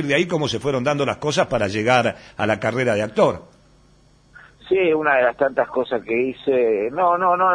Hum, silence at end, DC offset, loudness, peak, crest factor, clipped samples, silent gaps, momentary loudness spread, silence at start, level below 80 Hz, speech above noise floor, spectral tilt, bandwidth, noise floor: none; 0 s; under 0.1%; -20 LUFS; -2 dBFS; 18 dB; under 0.1%; none; 5 LU; 0 s; -52 dBFS; 34 dB; -5.5 dB/octave; 10.5 kHz; -54 dBFS